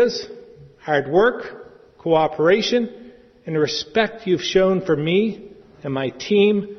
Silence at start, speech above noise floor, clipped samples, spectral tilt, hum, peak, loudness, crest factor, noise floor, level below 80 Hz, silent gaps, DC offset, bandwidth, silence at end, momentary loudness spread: 0 s; 24 dB; under 0.1%; -5.5 dB/octave; none; -2 dBFS; -20 LUFS; 18 dB; -43 dBFS; -54 dBFS; none; under 0.1%; 6.4 kHz; 0 s; 16 LU